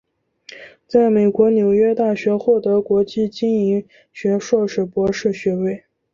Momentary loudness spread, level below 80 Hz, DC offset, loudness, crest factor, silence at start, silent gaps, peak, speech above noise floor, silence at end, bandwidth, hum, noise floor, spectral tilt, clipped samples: 9 LU; -56 dBFS; under 0.1%; -18 LUFS; 16 dB; 0.55 s; none; -2 dBFS; 29 dB; 0.35 s; 7.4 kHz; none; -46 dBFS; -7 dB/octave; under 0.1%